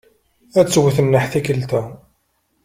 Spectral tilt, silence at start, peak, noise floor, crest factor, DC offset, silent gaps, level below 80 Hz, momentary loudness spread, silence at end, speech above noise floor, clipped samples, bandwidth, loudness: -6 dB/octave; 0.55 s; -2 dBFS; -66 dBFS; 16 dB; under 0.1%; none; -50 dBFS; 9 LU; 0.7 s; 50 dB; under 0.1%; 16 kHz; -17 LUFS